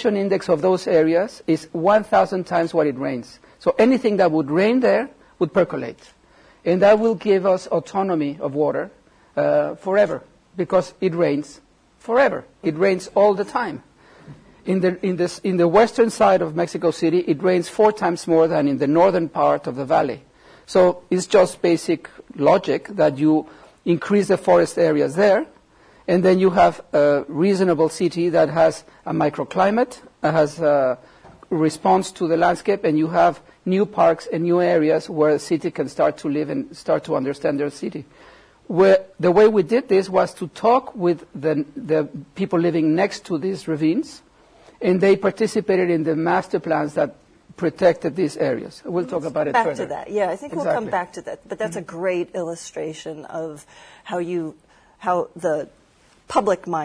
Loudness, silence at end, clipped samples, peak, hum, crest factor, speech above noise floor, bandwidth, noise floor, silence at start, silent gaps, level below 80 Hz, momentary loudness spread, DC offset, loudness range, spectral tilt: -20 LUFS; 0 s; under 0.1%; -4 dBFS; none; 16 dB; 36 dB; 11 kHz; -55 dBFS; 0 s; none; -58 dBFS; 11 LU; under 0.1%; 6 LU; -6.5 dB/octave